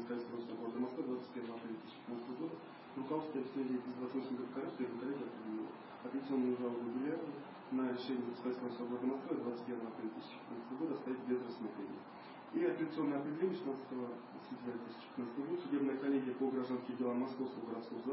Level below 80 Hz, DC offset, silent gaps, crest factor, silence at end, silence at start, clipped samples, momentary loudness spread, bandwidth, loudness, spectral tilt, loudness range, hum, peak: -90 dBFS; under 0.1%; none; 16 dB; 0 s; 0 s; under 0.1%; 10 LU; 5.6 kHz; -42 LUFS; -5.5 dB/octave; 4 LU; none; -24 dBFS